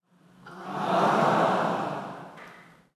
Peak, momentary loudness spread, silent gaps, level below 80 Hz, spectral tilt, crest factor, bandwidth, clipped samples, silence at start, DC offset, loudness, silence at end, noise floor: -10 dBFS; 22 LU; none; -76 dBFS; -6 dB/octave; 18 dB; 13 kHz; under 0.1%; 0.45 s; under 0.1%; -26 LUFS; 0.35 s; -53 dBFS